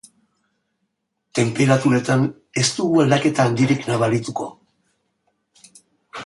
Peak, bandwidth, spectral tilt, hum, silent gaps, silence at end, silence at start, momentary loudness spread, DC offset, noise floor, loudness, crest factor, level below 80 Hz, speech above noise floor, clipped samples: -4 dBFS; 11.5 kHz; -5.5 dB/octave; none; none; 0 s; 1.35 s; 12 LU; under 0.1%; -74 dBFS; -19 LUFS; 18 dB; -58 dBFS; 56 dB; under 0.1%